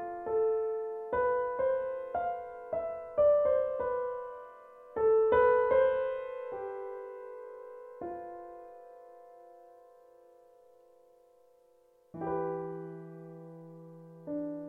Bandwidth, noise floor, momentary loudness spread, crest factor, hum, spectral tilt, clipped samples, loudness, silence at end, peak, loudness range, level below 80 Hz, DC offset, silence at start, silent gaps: 3.8 kHz; -65 dBFS; 24 LU; 18 dB; none; -8.5 dB/octave; under 0.1%; -31 LUFS; 0 s; -14 dBFS; 19 LU; -64 dBFS; under 0.1%; 0 s; none